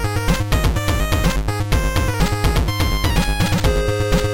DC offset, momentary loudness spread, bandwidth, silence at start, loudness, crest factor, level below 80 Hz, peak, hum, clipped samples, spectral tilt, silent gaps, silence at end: under 0.1%; 2 LU; 17 kHz; 0 s; -19 LUFS; 14 dB; -22 dBFS; -4 dBFS; none; under 0.1%; -5 dB/octave; none; 0 s